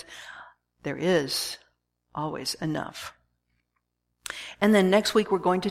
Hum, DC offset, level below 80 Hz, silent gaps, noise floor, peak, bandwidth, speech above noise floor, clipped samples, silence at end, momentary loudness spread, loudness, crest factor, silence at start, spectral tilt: 60 Hz at -60 dBFS; under 0.1%; -62 dBFS; none; -78 dBFS; -8 dBFS; 16 kHz; 53 dB; under 0.1%; 0 s; 21 LU; -26 LUFS; 20 dB; 0.1 s; -4.5 dB/octave